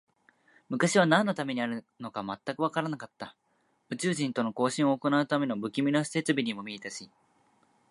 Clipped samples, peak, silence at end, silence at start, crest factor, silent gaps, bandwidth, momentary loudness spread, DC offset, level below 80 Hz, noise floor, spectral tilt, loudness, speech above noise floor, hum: under 0.1%; -8 dBFS; 0.85 s; 0.7 s; 22 dB; none; 11.5 kHz; 15 LU; under 0.1%; -78 dBFS; -72 dBFS; -5 dB/octave; -29 LUFS; 43 dB; none